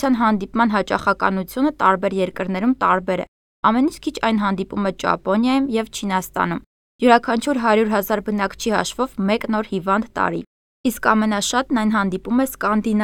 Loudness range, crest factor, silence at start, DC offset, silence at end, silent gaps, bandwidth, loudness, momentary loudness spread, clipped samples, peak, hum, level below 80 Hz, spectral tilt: 2 LU; 20 dB; 0 s; under 0.1%; 0 s; 3.28-3.63 s, 6.66-6.99 s, 10.47-10.84 s; 17 kHz; -20 LUFS; 6 LU; under 0.1%; 0 dBFS; none; -48 dBFS; -5 dB/octave